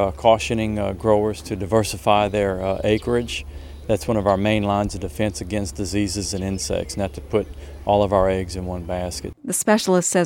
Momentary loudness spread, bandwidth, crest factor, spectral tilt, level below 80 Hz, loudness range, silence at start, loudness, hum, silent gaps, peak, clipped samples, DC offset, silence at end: 10 LU; 17 kHz; 20 dB; -5 dB/octave; -38 dBFS; 3 LU; 0 s; -22 LUFS; none; none; 0 dBFS; under 0.1%; under 0.1%; 0 s